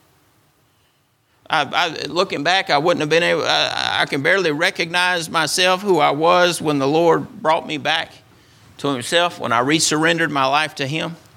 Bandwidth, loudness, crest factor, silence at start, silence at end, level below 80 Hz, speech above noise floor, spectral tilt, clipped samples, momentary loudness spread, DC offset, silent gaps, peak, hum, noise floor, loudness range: 16.5 kHz; -17 LUFS; 18 dB; 1.5 s; 0.2 s; -62 dBFS; 43 dB; -3 dB/octave; under 0.1%; 6 LU; under 0.1%; none; 0 dBFS; none; -61 dBFS; 3 LU